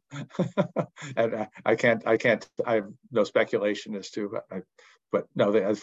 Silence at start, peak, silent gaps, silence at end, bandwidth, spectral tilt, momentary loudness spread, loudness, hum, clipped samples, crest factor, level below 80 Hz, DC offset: 0.1 s; -8 dBFS; none; 0 s; 8 kHz; -6 dB/octave; 10 LU; -27 LUFS; none; under 0.1%; 20 dB; -72 dBFS; under 0.1%